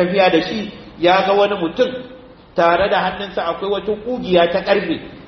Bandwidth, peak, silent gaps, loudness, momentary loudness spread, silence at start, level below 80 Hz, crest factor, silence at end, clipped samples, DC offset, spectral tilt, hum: 6.4 kHz; -2 dBFS; none; -17 LUFS; 11 LU; 0 s; -48 dBFS; 16 dB; 0 s; under 0.1%; under 0.1%; -6.5 dB/octave; none